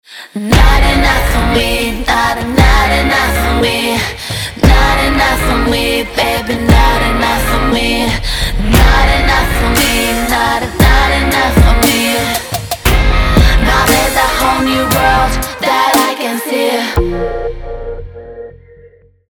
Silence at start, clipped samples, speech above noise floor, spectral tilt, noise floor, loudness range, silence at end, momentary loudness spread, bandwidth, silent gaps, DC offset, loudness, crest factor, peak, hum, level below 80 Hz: 0.1 s; under 0.1%; 32 dB; -4.5 dB/octave; -42 dBFS; 2 LU; 0.8 s; 8 LU; over 20 kHz; none; under 0.1%; -11 LUFS; 12 dB; 0 dBFS; none; -16 dBFS